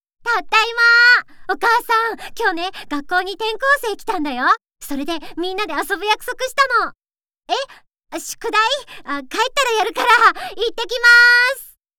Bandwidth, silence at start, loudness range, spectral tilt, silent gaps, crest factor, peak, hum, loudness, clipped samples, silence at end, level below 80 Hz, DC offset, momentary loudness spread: over 20 kHz; 0.25 s; 7 LU; -0.5 dB/octave; none; 16 dB; -2 dBFS; none; -16 LUFS; under 0.1%; 0.3 s; -50 dBFS; under 0.1%; 16 LU